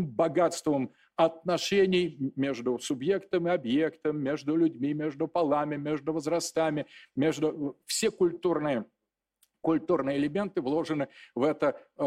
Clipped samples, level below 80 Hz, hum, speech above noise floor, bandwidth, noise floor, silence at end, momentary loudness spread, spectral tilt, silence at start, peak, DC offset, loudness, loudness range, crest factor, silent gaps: under 0.1%; -68 dBFS; none; 50 dB; 15 kHz; -79 dBFS; 0 s; 6 LU; -5 dB/octave; 0 s; -12 dBFS; under 0.1%; -29 LUFS; 2 LU; 18 dB; none